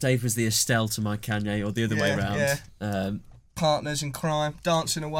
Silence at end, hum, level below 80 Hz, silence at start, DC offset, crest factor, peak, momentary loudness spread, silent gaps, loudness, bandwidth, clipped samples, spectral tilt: 0 s; none; -52 dBFS; 0 s; under 0.1%; 18 dB; -10 dBFS; 7 LU; none; -26 LUFS; 17 kHz; under 0.1%; -4 dB/octave